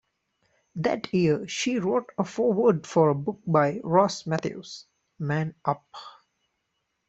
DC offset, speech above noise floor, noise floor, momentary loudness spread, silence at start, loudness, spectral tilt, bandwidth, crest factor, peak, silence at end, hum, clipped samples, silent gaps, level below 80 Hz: under 0.1%; 53 dB; -78 dBFS; 15 LU; 0.75 s; -25 LUFS; -6 dB/octave; 8.2 kHz; 20 dB; -6 dBFS; 1 s; none; under 0.1%; none; -66 dBFS